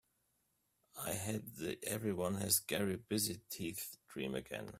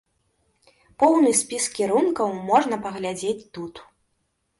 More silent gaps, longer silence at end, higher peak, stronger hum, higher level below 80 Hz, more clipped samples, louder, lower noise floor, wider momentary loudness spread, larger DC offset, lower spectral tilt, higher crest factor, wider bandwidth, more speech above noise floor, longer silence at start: neither; second, 0 s vs 0.75 s; second, -18 dBFS vs -6 dBFS; neither; second, -70 dBFS vs -64 dBFS; neither; second, -39 LUFS vs -22 LUFS; first, -81 dBFS vs -73 dBFS; about the same, 12 LU vs 14 LU; neither; about the same, -3.5 dB/octave vs -3.5 dB/octave; first, 24 dB vs 18 dB; first, 16 kHz vs 11.5 kHz; second, 41 dB vs 51 dB; about the same, 0.95 s vs 1 s